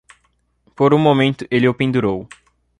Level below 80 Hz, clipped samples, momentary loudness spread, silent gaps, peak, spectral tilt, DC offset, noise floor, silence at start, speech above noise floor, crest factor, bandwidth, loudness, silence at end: -52 dBFS; under 0.1%; 7 LU; none; -2 dBFS; -7.5 dB/octave; under 0.1%; -63 dBFS; 0.8 s; 48 dB; 16 dB; 10.5 kHz; -16 LUFS; 0.55 s